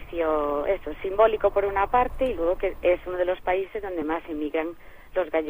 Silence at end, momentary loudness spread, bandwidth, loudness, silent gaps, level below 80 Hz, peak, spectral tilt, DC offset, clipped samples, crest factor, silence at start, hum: 0 s; 8 LU; 15.5 kHz; -25 LUFS; none; -42 dBFS; -6 dBFS; -7 dB/octave; under 0.1%; under 0.1%; 18 dB; 0 s; none